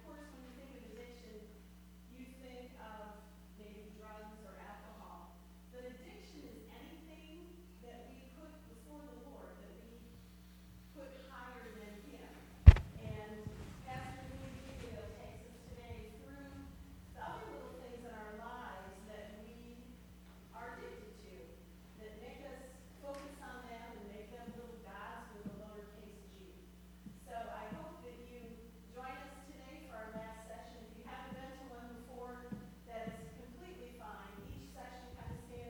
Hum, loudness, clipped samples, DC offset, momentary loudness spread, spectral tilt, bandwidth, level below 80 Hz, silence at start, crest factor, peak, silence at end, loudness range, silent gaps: none; -41 LUFS; under 0.1%; under 0.1%; 9 LU; -7.5 dB/octave; 19.5 kHz; -44 dBFS; 0 s; 36 dB; -4 dBFS; 0 s; 22 LU; none